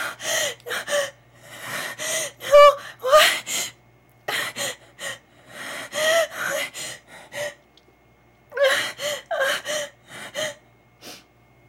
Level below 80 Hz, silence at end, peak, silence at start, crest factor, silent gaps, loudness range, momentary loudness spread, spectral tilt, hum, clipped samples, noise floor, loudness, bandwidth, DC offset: -60 dBFS; 0.5 s; -4 dBFS; 0 s; 20 dB; none; 8 LU; 21 LU; 0 dB/octave; none; under 0.1%; -56 dBFS; -21 LUFS; 16.5 kHz; under 0.1%